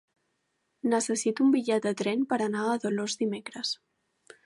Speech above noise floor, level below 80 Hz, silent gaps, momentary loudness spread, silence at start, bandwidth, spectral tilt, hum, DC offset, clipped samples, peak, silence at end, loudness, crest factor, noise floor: 50 dB; -82 dBFS; none; 9 LU; 0.85 s; 11.5 kHz; -4 dB/octave; none; under 0.1%; under 0.1%; -12 dBFS; 0.7 s; -28 LUFS; 16 dB; -77 dBFS